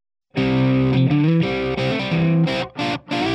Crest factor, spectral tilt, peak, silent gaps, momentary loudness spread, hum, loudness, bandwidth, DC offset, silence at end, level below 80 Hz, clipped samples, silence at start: 12 dB; -7.5 dB/octave; -6 dBFS; none; 6 LU; none; -19 LUFS; 8.6 kHz; under 0.1%; 0 s; -44 dBFS; under 0.1%; 0.35 s